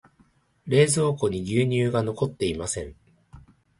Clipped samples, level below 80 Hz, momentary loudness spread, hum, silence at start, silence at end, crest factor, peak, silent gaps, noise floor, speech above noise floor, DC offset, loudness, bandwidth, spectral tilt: under 0.1%; -50 dBFS; 11 LU; none; 0.65 s; 0.4 s; 20 dB; -6 dBFS; none; -62 dBFS; 39 dB; under 0.1%; -24 LUFS; 11.5 kHz; -5.5 dB/octave